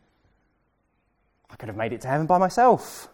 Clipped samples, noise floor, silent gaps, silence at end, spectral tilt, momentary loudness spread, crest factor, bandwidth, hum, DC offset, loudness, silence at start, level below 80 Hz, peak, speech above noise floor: under 0.1%; -70 dBFS; none; 0.1 s; -6 dB/octave; 16 LU; 18 dB; 17.5 kHz; none; under 0.1%; -22 LUFS; 1.6 s; -60 dBFS; -8 dBFS; 48 dB